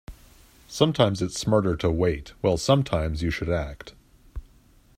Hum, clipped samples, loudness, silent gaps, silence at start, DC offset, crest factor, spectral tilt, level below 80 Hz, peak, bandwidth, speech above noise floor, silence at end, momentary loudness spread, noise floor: none; under 0.1%; -24 LUFS; none; 0.1 s; under 0.1%; 20 dB; -6 dB/octave; -42 dBFS; -4 dBFS; 15.5 kHz; 33 dB; 0.55 s; 23 LU; -56 dBFS